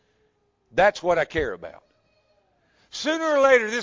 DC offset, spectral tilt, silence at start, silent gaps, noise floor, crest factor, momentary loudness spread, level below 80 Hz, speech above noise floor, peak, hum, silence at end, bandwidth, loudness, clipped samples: under 0.1%; -3.5 dB/octave; 0.75 s; none; -68 dBFS; 18 dB; 20 LU; -52 dBFS; 46 dB; -6 dBFS; none; 0 s; 7.6 kHz; -22 LUFS; under 0.1%